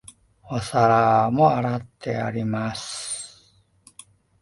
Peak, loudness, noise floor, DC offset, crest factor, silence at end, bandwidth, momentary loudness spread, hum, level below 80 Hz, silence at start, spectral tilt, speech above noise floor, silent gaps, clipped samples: -4 dBFS; -22 LUFS; -59 dBFS; under 0.1%; 18 dB; 1.15 s; 11.5 kHz; 13 LU; none; -56 dBFS; 0.45 s; -5.5 dB/octave; 37 dB; none; under 0.1%